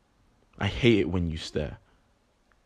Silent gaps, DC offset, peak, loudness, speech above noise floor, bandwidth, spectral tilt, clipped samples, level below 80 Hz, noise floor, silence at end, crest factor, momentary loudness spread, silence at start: none; under 0.1%; -8 dBFS; -27 LUFS; 41 dB; 10 kHz; -6.5 dB/octave; under 0.1%; -48 dBFS; -67 dBFS; 0.9 s; 22 dB; 11 LU; 0.6 s